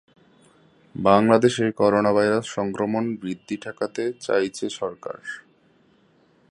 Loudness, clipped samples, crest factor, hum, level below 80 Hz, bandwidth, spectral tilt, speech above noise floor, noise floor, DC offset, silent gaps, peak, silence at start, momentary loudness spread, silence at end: -22 LUFS; under 0.1%; 22 dB; none; -60 dBFS; 11 kHz; -5.5 dB/octave; 38 dB; -60 dBFS; under 0.1%; none; -2 dBFS; 0.95 s; 16 LU; 1.1 s